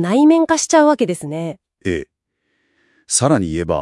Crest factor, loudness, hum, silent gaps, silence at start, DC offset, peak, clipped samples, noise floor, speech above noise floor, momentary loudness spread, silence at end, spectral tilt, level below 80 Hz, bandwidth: 16 dB; -16 LUFS; none; none; 0 s; under 0.1%; 0 dBFS; under 0.1%; -69 dBFS; 54 dB; 14 LU; 0 s; -4.5 dB/octave; -48 dBFS; 12 kHz